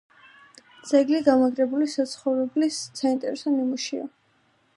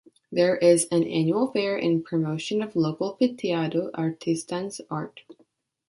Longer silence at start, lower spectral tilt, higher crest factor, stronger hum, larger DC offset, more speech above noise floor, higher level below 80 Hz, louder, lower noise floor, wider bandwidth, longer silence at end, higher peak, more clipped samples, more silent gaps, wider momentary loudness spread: first, 0.85 s vs 0.3 s; second, -3.5 dB/octave vs -5.5 dB/octave; about the same, 20 dB vs 18 dB; neither; neither; about the same, 42 dB vs 40 dB; about the same, -70 dBFS vs -70 dBFS; about the same, -24 LUFS vs -25 LUFS; about the same, -65 dBFS vs -65 dBFS; about the same, 11.5 kHz vs 11.5 kHz; first, 0.7 s vs 0.55 s; about the same, -6 dBFS vs -6 dBFS; neither; neither; about the same, 10 LU vs 12 LU